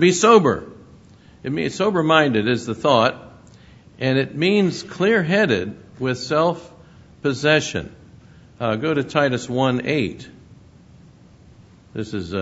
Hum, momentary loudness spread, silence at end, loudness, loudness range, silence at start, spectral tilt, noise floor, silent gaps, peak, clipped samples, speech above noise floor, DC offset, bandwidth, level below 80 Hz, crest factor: none; 14 LU; 0 s; -19 LUFS; 4 LU; 0 s; -5 dB/octave; -48 dBFS; none; 0 dBFS; under 0.1%; 29 dB; under 0.1%; 8 kHz; -54 dBFS; 20 dB